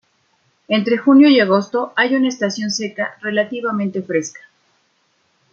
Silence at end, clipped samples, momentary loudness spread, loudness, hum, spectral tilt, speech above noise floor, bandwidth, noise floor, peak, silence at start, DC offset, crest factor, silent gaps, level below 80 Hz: 1.15 s; under 0.1%; 12 LU; -16 LUFS; none; -4.5 dB/octave; 47 dB; 7.6 kHz; -63 dBFS; -2 dBFS; 0.7 s; under 0.1%; 16 dB; none; -68 dBFS